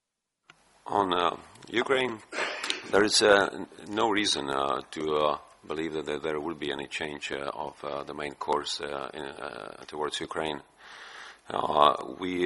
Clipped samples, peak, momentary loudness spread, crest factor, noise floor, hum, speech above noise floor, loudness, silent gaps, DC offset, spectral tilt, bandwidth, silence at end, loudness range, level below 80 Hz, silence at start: under 0.1%; -4 dBFS; 17 LU; 26 dB; -66 dBFS; none; 37 dB; -29 LUFS; none; under 0.1%; -3 dB/octave; 11.5 kHz; 0 s; 8 LU; -62 dBFS; 0.85 s